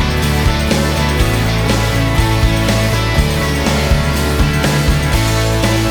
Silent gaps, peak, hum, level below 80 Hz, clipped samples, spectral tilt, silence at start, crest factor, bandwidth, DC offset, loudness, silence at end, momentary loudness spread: none; 0 dBFS; none; -18 dBFS; under 0.1%; -5 dB/octave; 0 s; 12 dB; over 20 kHz; under 0.1%; -14 LUFS; 0 s; 1 LU